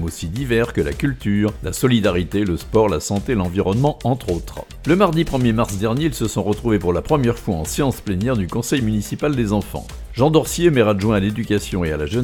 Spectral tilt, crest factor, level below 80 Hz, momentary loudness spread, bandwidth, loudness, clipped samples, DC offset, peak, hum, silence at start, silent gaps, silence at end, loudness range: -6 dB/octave; 18 dB; -34 dBFS; 6 LU; 18 kHz; -19 LUFS; under 0.1%; under 0.1%; 0 dBFS; none; 0 s; none; 0 s; 1 LU